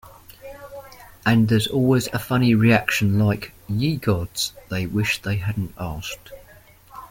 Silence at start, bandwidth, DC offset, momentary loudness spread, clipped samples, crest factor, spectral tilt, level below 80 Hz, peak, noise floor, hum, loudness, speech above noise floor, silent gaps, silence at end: 0.05 s; 17 kHz; under 0.1%; 22 LU; under 0.1%; 20 dB; -5.5 dB/octave; -46 dBFS; -2 dBFS; -49 dBFS; none; -21 LUFS; 28 dB; none; 0.05 s